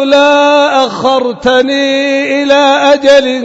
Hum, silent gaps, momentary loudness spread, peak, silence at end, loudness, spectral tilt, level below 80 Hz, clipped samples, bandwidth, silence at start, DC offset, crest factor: none; none; 5 LU; 0 dBFS; 0 s; -8 LUFS; -3 dB/octave; -46 dBFS; 0.5%; 8 kHz; 0 s; under 0.1%; 8 dB